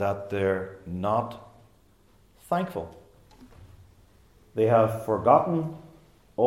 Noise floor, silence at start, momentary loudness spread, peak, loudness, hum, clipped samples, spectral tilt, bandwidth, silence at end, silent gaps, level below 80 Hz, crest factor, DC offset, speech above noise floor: -60 dBFS; 0 s; 18 LU; -4 dBFS; -26 LUFS; none; under 0.1%; -8 dB/octave; 16.5 kHz; 0 s; none; -60 dBFS; 22 dB; under 0.1%; 35 dB